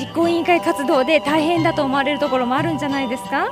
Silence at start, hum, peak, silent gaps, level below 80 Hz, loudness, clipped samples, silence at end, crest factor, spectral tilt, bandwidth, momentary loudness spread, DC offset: 0 s; none; -4 dBFS; none; -52 dBFS; -18 LUFS; under 0.1%; 0 s; 16 dB; -5.5 dB/octave; 15.5 kHz; 5 LU; under 0.1%